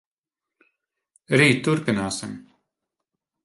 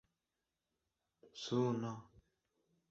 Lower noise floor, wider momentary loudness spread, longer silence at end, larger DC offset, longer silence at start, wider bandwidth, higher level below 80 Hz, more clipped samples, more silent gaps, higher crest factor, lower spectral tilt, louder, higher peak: about the same, -89 dBFS vs under -90 dBFS; about the same, 18 LU vs 17 LU; first, 1.05 s vs 0.85 s; neither; about the same, 1.3 s vs 1.25 s; first, 11.5 kHz vs 7.6 kHz; first, -60 dBFS vs -80 dBFS; neither; neither; about the same, 22 dB vs 20 dB; second, -5 dB/octave vs -6.5 dB/octave; first, -21 LUFS vs -40 LUFS; first, -4 dBFS vs -24 dBFS